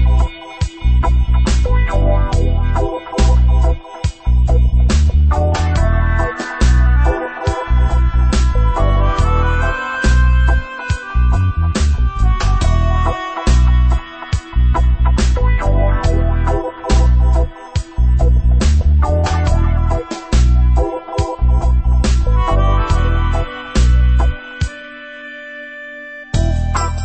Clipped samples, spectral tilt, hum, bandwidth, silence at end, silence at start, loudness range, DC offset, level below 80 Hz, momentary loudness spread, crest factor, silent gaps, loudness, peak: under 0.1%; -6.5 dB/octave; none; 8.6 kHz; 0 s; 0 s; 2 LU; under 0.1%; -14 dBFS; 9 LU; 12 dB; none; -16 LUFS; -2 dBFS